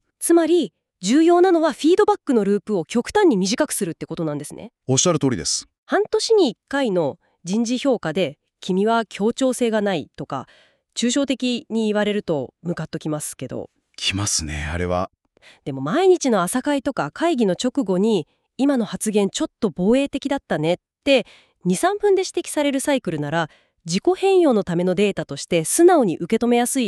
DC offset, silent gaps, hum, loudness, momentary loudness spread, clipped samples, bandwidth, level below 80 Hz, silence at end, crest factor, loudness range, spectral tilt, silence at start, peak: under 0.1%; 5.78-5.86 s; none; -20 LUFS; 12 LU; under 0.1%; 13.5 kHz; -50 dBFS; 0 s; 16 dB; 6 LU; -4.5 dB/octave; 0.2 s; -4 dBFS